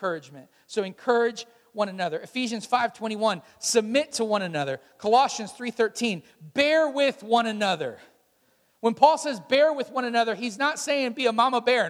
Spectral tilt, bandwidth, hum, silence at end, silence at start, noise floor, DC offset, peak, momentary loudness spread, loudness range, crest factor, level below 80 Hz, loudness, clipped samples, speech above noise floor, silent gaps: -3 dB/octave; 15 kHz; none; 0 s; 0 s; -66 dBFS; under 0.1%; -4 dBFS; 10 LU; 3 LU; 20 dB; -74 dBFS; -25 LUFS; under 0.1%; 41 dB; none